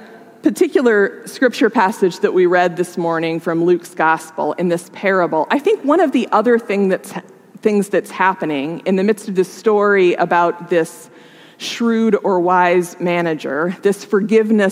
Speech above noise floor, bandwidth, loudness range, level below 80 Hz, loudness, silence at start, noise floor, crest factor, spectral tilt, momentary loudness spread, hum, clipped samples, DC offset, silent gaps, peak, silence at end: 27 dB; 15.5 kHz; 2 LU; -78 dBFS; -16 LUFS; 0 s; -42 dBFS; 16 dB; -6 dB/octave; 7 LU; none; under 0.1%; under 0.1%; none; 0 dBFS; 0 s